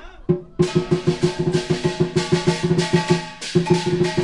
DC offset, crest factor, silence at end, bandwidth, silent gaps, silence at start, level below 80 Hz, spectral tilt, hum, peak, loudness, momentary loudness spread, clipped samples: 0.4%; 18 dB; 0 s; 11.5 kHz; none; 0 s; -46 dBFS; -6 dB/octave; none; -2 dBFS; -20 LUFS; 4 LU; under 0.1%